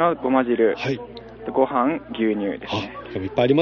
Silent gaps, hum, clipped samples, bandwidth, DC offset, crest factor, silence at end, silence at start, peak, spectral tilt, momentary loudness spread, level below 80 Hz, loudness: none; none; under 0.1%; 6.8 kHz; under 0.1%; 18 dB; 0 s; 0 s; -4 dBFS; -5 dB/octave; 11 LU; -54 dBFS; -23 LUFS